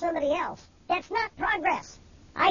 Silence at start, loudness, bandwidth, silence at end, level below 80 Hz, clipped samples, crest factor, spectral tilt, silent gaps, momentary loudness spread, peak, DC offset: 0 s; -28 LUFS; 7.4 kHz; 0 s; -56 dBFS; under 0.1%; 18 dB; -4 dB/octave; none; 15 LU; -10 dBFS; under 0.1%